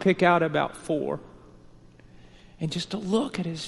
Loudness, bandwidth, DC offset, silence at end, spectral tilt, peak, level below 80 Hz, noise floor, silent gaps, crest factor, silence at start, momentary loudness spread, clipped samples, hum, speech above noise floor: -26 LUFS; 11.5 kHz; under 0.1%; 0 s; -6 dB/octave; -6 dBFS; -56 dBFS; -51 dBFS; none; 22 dB; 0 s; 12 LU; under 0.1%; 60 Hz at -55 dBFS; 25 dB